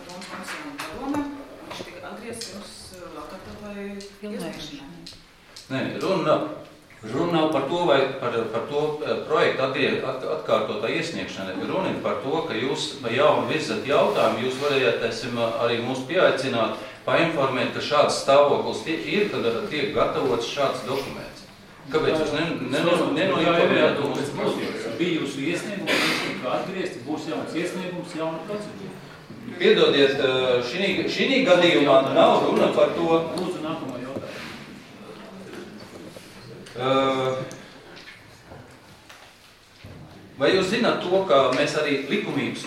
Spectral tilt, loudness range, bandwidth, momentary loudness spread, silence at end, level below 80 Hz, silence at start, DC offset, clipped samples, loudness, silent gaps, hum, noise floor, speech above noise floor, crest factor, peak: -5 dB/octave; 14 LU; 15.5 kHz; 20 LU; 0 s; -58 dBFS; 0 s; under 0.1%; under 0.1%; -23 LUFS; none; none; -51 dBFS; 28 dB; 20 dB; -4 dBFS